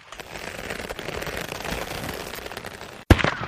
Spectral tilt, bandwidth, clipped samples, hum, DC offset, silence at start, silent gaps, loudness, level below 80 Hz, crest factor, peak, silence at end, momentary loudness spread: -5 dB/octave; 15.5 kHz; under 0.1%; none; under 0.1%; 0 s; none; -28 LUFS; -34 dBFS; 26 dB; -2 dBFS; 0 s; 16 LU